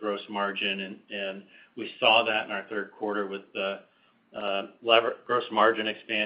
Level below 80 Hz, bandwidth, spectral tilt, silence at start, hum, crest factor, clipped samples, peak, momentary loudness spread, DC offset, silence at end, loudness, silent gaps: -78 dBFS; 5.4 kHz; -7.5 dB/octave; 0 s; none; 24 dB; under 0.1%; -4 dBFS; 15 LU; under 0.1%; 0 s; -27 LUFS; none